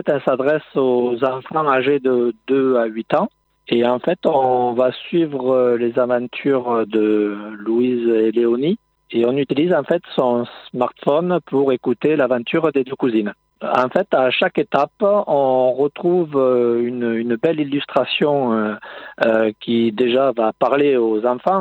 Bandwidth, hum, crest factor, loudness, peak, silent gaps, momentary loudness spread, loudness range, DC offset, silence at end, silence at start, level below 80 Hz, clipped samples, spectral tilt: 5.4 kHz; none; 18 dB; -18 LUFS; 0 dBFS; none; 5 LU; 1 LU; under 0.1%; 0 s; 0.05 s; -66 dBFS; under 0.1%; -8 dB/octave